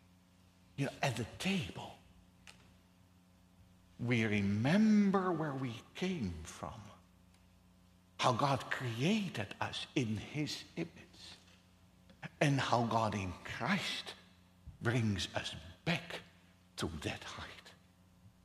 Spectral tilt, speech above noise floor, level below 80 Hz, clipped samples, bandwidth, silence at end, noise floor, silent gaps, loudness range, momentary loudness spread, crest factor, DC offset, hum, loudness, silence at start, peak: -5.5 dB/octave; 30 dB; -64 dBFS; under 0.1%; 14 kHz; 0.15 s; -66 dBFS; none; 8 LU; 19 LU; 22 dB; under 0.1%; none; -36 LUFS; 0.8 s; -16 dBFS